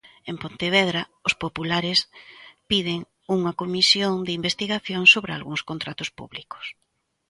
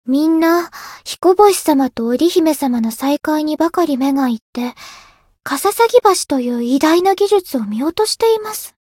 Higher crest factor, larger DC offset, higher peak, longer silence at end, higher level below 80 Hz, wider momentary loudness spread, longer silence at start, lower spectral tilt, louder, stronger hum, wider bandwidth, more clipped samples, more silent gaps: first, 22 dB vs 16 dB; neither; about the same, -2 dBFS vs 0 dBFS; first, 0.6 s vs 0.2 s; about the same, -58 dBFS vs -56 dBFS; first, 20 LU vs 13 LU; first, 0.25 s vs 0.05 s; about the same, -3.5 dB/octave vs -3.5 dB/octave; second, -22 LUFS vs -15 LUFS; neither; second, 11.5 kHz vs 17.5 kHz; neither; second, none vs 4.42-4.53 s